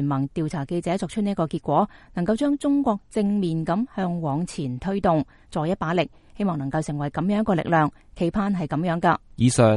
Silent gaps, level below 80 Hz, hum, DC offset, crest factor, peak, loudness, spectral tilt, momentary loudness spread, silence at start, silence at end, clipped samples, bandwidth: none; -48 dBFS; none; under 0.1%; 20 dB; -2 dBFS; -24 LUFS; -6.5 dB/octave; 6 LU; 0 s; 0 s; under 0.1%; 11.5 kHz